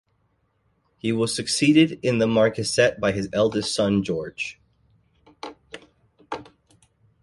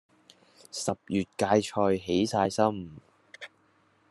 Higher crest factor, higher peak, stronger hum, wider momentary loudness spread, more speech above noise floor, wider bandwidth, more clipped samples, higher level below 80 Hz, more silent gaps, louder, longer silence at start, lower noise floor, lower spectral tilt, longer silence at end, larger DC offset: about the same, 20 dB vs 22 dB; about the same, -6 dBFS vs -8 dBFS; neither; about the same, 22 LU vs 21 LU; first, 47 dB vs 39 dB; about the same, 11.5 kHz vs 12.5 kHz; neither; first, -56 dBFS vs -70 dBFS; neither; first, -22 LUFS vs -28 LUFS; first, 1.05 s vs 0.75 s; about the same, -68 dBFS vs -66 dBFS; about the same, -4.5 dB/octave vs -5 dB/octave; first, 0.8 s vs 0.65 s; neither